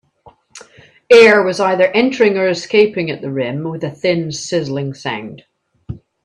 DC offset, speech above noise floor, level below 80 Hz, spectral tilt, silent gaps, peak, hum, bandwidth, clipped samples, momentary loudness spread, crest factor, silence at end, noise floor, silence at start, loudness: under 0.1%; 34 dB; -54 dBFS; -5 dB/octave; none; 0 dBFS; none; 11 kHz; under 0.1%; 16 LU; 16 dB; 0.25 s; -48 dBFS; 0.55 s; -14 LUFS